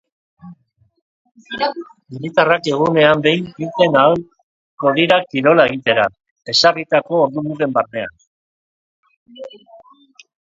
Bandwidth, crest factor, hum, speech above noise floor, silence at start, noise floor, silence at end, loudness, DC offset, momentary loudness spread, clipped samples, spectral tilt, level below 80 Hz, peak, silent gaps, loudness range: 7.8 kHz; 18 dB; none; 36 dB; 0.45 s; -52 dBFS; 0.7 s; -15 LUFS; under 0.1%; 19 LU; under 0.1%; -5 dB/octave; -58 dBFS; 0 dBFS; 1.02-1.25 s, 4.43-4.78 s, 6.31-6.36 s, 8.27-9.03 s, 9.16-9.26 s; 6 LU